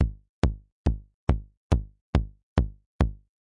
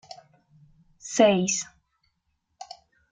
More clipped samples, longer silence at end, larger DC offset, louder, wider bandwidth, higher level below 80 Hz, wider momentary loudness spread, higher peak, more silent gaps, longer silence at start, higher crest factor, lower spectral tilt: neither; second, 0.25 s vs 0.45 s; neither; second, -30 LUFS vs -23 LUFS; about the same, 9 kHz vs 9.6 kHz; first, -32 dBFS vs -68 dBFS; second, 2 LU vs 24 LU; about the same, -8 dBFS vs -6 dBFS; first, 0.29-0.42 s, 0.72-0.85 s, 1.14-1.27 s, 1.57-1.70 s, 2.01-2.13 s, 2.43-2.56 s, 2.86-2.99 s vs none; second, 0 s vs 1.05 s; about the same, 20 dB vs 24 dB; first, -8 dB/octave vs -4 dB/octave